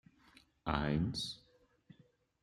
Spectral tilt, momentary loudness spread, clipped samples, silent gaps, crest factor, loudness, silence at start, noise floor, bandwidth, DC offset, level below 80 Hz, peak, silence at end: -5.5 dB/octave; 11 LU; under 0.1%; none; 24 dB; -38 LUFS; 0.65 s; -69 dBFS; 13.5 kHz; under 0.1%; -54 dBFS; -16 dBFS; 1.05 s